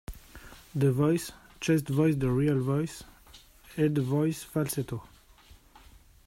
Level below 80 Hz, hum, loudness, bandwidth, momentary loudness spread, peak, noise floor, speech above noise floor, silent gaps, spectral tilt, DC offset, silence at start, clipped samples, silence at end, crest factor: -52 dBFS; none; -28 LUFS; 16 kHz; 19 LU; -14 dBFS; -56 dBFS; 29 dB; none; -7 dB/octave; under 0.1%; 0.1 s; under 0.1%; 1.25 s; 16 dB